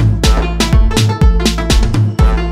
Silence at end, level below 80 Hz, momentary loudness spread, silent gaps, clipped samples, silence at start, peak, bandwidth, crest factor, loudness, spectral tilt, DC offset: 0 s; -12 dBFS; 2 LU; none; under 0.1%; 0 s; 0 dBFS; 15 kHz; 10 dB; -13 LUFS; -5.5 dB/octave; under 0.1%